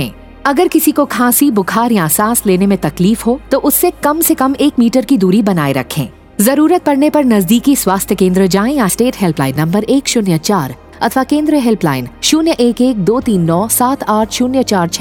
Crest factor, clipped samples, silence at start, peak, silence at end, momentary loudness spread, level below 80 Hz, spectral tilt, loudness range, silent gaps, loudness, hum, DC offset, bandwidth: 12 dB; under 0.1%; 0 s; 0 dBFS; 0 s; 5 LU; -40 dBFS; -5 dB/octave; 2 LU; none; -12 LUFS; none; under 0.1%; 19.5 kHz